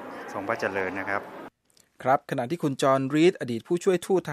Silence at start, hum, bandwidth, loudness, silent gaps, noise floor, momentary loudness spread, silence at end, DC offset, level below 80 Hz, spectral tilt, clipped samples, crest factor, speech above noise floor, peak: 0 s; none; 14.5 kHz; -26 LUFS; none; -64 dBFS; 12 LU; 0 s; under 0.1%; -72 dBFS; -6 dB/octave; under 0.1%; 18 dB; 39 dB; -8 dBFS